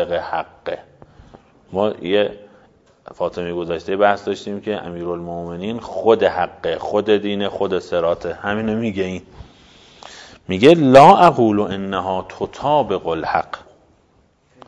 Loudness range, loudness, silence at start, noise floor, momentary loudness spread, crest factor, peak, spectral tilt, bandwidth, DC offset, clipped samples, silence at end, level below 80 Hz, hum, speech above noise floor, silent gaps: 10 LU; -18 LUFS; 0 s; -57 dBFS; 16 LU; 18 dB; 0 dBFS; -6.5 dB/octave; 11 kHz; under 0.1%; 0.2%; 1.1 s; -52 dBFS; none; 40 dB; none